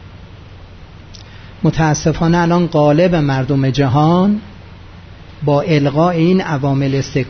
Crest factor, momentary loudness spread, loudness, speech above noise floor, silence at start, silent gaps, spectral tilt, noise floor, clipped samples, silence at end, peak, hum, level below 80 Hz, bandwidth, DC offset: 12 dB; 5 LU; -14 LUFS; 23 dB; 0 s; none; -7 dB/octave; -36 dBFS; under 0.1%; 0 s; -2 dBFS; none; -38 dBFS; 6.6 kHz; under 0.1%